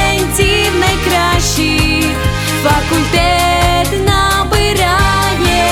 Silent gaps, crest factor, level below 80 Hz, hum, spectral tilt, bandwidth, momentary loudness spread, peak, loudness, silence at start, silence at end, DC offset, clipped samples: none; 10 dB; -20 dBFS; none; -4 dB/octave; 19 kHz; 2 LU; -2 dBFS; -12 LUFS; 0 s; 0 s; under 0.1%; under 0.1%